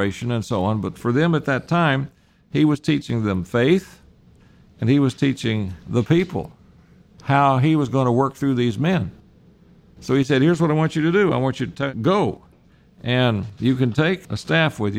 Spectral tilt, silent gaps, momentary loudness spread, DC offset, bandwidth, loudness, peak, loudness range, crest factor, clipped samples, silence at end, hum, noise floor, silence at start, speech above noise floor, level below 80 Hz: -7 dB/octave; none; 8 LU; under 0.1%; 13 kHz; -20 LUFS; -4 dBFS; 2 LU; 16 dB; under 0.1%; 0 s; none; -53 dBFS; 0 s; 33 dB; -50 dBFS